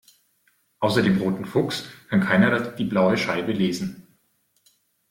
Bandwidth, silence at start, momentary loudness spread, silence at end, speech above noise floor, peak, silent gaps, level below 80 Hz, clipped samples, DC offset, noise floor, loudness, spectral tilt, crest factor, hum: 15.5 kHz; 0.8 s; 9 LU; 1.1 s; 46 dB; -6 dBFS; none; -58 dBFS; under 0.1%; under 0.1%; -68 dBFS; -23 LUFS; -6 dB/octave; 18 dB; none